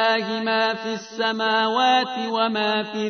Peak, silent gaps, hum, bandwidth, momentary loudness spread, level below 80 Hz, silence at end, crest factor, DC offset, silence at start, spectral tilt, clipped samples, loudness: -6 dBFS; none; none; 6.6 kHz; 6 LU; -78 dBFS; 0 s; 16 dB; under 0.1%; 0 s; -3.5 dB/octave; under 0.1%; -21 LUFS